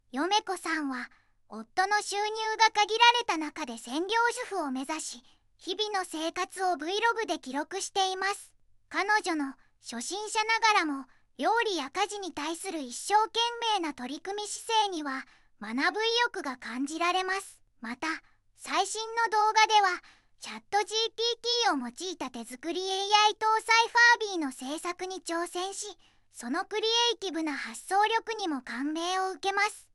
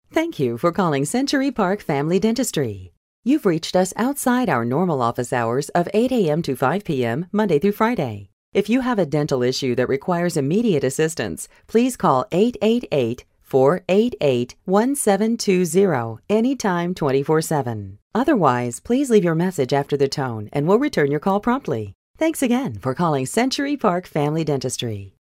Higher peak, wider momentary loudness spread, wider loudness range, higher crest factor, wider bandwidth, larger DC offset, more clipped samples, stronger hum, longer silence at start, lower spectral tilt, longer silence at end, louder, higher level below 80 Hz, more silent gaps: second, -8 dBFS vs -2 dBFS; first, 15 LU vs 7 LU; first, 6 LU vs 2 LU; about the same, 22 dB vs 18 dB; second, 13.5 kHz vs 16 kHz; neither; neither; neither; about the same, 0.15 s vs 0.15 s; second, 0 dB/octave vs -5.5 dB/octave; second, 0.15 s vs 0.3 s; second, -28 LUFS vs -20 LUFS; second, -70 dBFS vs -54 dBFS; second, none vs 2.97-3.23 s, 8.33-8.52 s, 18.02-18.10 s, 21.95-22.14 s